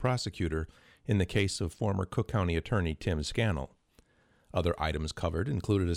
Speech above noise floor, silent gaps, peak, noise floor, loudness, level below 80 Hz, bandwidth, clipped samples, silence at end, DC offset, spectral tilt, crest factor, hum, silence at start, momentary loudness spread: 36 dB; none; -14 dBFS; -67 dBFS; -32 LUFS; -44 dBFS; 13.5 kHz; under 0.1%; 0 s; under 0.1%; -6 dB/octave; 16 dB; none; 0 s; 7 LU